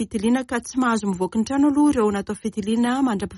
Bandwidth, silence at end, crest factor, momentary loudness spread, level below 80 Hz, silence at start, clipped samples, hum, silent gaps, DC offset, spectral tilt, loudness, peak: 11.5 kHz; 0 s; 12 dB; 8 LU; -50 dBFS; 0 s; under 0.1%; none; none; under 0.1%; -5.5 dB/octave; -21 LUFS; -10 dBFS